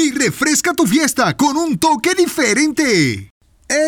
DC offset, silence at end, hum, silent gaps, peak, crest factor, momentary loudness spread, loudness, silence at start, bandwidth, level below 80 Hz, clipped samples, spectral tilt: under 0.1%; 0 s; none; 3.31-3.41 s; -4 dBFS; 12 dB; 2 LU; -15 LUFS; 0 s; 19.5 kHz; -50 dBFS; under 0.1%; -3.5 dB/octave